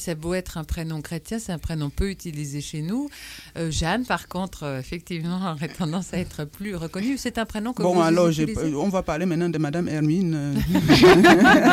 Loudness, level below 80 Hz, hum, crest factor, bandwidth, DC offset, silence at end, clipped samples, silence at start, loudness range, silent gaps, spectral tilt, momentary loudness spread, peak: -22 LUFS; -40 dBFS; none; 18 dB; 16 kHz; under 0.1%; 0 s; under 0.1%; 0 s; 10 LU; none; -5.5 dB/octave; 17 LU; -4 dBFS